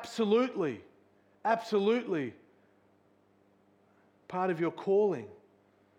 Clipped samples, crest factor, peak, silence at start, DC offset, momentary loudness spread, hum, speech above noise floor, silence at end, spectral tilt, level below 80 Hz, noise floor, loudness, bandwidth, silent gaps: under 0.1%; 20 dB; -14 dBFS; 0 s; under 0.1%; 12 LU; 50 Hz at -65 dBFS; 37 dB; 0.65 s; -6.5 dB/octave; -86 dBFS; -67 dBFS; -31 LUFS; 10.5 kHz; none